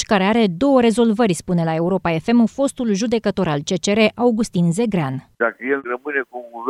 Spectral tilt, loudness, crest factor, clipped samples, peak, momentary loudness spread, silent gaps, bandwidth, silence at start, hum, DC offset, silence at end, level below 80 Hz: -6 dB/octave; -18 LUFS; 16 dB; under 0.1%; -2 dBFS; 7 LU; none; 12.5 kHz; 0 s; none; under 0.1%; 0 s; -50 dBFS